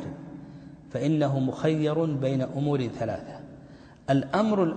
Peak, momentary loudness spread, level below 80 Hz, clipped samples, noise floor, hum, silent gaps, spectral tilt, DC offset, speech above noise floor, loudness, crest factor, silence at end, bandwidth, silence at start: -10 dBFS; 19 LU; -58 dBFS; under 0.1%; -49 dBFS; none; none; -8 dB/octave; under 0.1%; 23 dB; -27 LUFS; 16 dB; 0 s; 8.8 kHz; 0 s